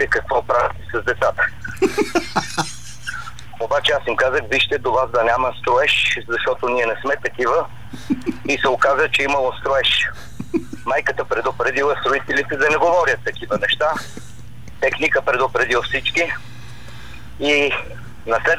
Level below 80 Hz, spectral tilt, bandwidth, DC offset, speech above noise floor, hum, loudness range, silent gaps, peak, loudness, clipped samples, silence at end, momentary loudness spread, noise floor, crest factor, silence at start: -44 dBFS; -3.5 dB/octave; 19.5 kHz; 2%; 20 dB; none; 3 LU; none; -4 dBFS; -19 LUFS; under 0.1%; 0 s; 14 LU; -39 dBFS; 14 dB; 0 s